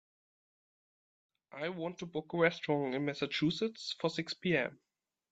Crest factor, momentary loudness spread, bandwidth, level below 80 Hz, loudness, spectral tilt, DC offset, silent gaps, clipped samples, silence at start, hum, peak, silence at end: 22 dB; 10 LU; 8.2 kHz; -74 dBFS; -35 LUFS; -5.5 dB/octave; under 0.1%; none; under 0.1%; 1.55 s; none; -14 dBFS; 0.6 s